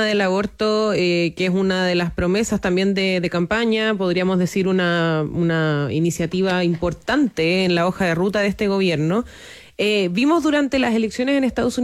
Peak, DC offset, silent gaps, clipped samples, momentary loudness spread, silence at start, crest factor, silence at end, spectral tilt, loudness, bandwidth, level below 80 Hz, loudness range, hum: -8 dBFS; under 0.1%; none; under 0.1%; 3 LU; 0 s; 10 dB; 0 s; -5.5 dB/octave; -19 LUFS; 14 kHz; -46 dBFS; 1 LU; none